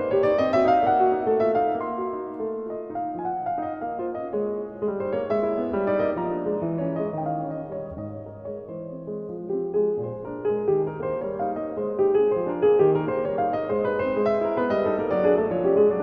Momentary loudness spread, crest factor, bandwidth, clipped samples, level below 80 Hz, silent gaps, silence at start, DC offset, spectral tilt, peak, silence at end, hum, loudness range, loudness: 13 LU; 16 dB; 5.4 kHz; under 0.1%; -58 dBFS; none; 0 s; under 0.1%; -9 dB/octave; -8 dBFS; 0 s; none; 7 LU; -25 LUFS